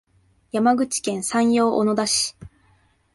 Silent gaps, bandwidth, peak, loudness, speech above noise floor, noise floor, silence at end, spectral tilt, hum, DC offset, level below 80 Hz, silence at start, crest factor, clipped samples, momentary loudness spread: none; 11.5 kHz; -8 dBFS; -21 LUFS; 40 dB; -60 dBFS; 0.7 s; -3.5 dB/octave; none; under 0.1%; -58 dBFS; 0.55 s; 14 dB; under 0.1%; 6 LU